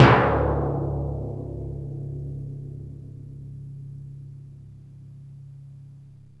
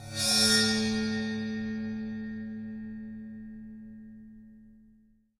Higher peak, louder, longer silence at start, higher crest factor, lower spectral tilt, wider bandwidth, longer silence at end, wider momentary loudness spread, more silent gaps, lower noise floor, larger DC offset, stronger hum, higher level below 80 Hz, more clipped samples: first, 0 dBFS vs -12 dBFS; about the same, -26 LUFS vs -28 LUFS; about the same, 0 s vs 0 s; first, 26 dB vs 20 dB; first, -8 dB/octave vs -2.5 dB/octave; second, 7.2 kHz vs 16 kHz; second, 0.25 s vs 0.6 s; second, 22 LU vs 25 LU; neither; second, -47 dBFS vs -62 dBFS; first, 0.1% vs under 0.1%; neither; first, -38 dBFS vs -60 dBFS; neither